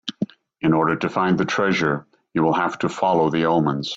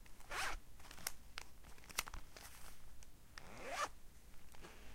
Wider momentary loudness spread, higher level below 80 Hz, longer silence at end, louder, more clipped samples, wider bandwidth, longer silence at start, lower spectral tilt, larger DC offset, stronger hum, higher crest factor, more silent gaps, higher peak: second, 10 LU vs 19 LU; about the same, -58 dBFS vs -58 dBFS; about the same, 0 s vs 0 s; first, -21 LUFS vs -48 LUFS; neither; second, 8 kHz vs 16.5 kHz; about the same, 0.05 s vs 0 s; first, -6 dB/octave vs -1.5 dB/octave; neither; neither; second, 14 dB vs 30 dB; neither; first, -6 dBFS vs -18 dBFS